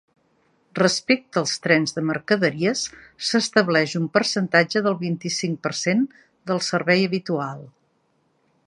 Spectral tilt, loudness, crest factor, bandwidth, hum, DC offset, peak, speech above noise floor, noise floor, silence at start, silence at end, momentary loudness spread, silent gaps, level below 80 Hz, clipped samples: -4 dB/octave; -22 LUFS; 20 dB; 11.5 kHz; none; under 0.1%; -2 dBFS; 45 dB; -67 dBFS; 0.75 s; 0.95 s; 9 LU; none; -66 dBFS; under 0.1%